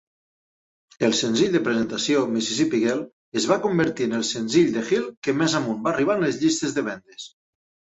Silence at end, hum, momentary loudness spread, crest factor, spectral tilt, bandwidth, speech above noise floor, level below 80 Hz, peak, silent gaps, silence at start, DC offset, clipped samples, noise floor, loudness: 0.65 s; none; 8 LU; 18 dB; -4 dB/octave; 8.2 kHz; over 68 dB; -62 dBFS; -6 dBFS; 3.13-3.32 s, 5.17-5.22 s; 1 s; under 0.1%; under 0.1%; under -90 dBFS; -22 LUFS